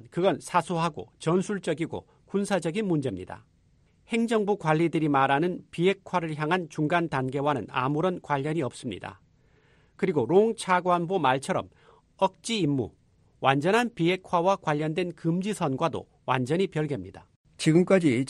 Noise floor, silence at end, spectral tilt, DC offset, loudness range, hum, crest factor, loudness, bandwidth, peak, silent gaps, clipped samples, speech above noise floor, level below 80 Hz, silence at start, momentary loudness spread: -63 dBFS; 0 s; -6 dB/octave; under 0.1%; 3 LU; none; 20 dB; -27 LUFS; 12.5 kHz; -6 dBFS; 17.36-17.44 s; under 0.1%; 37 dB; -64 dBFS; 0.05 s; 10 LU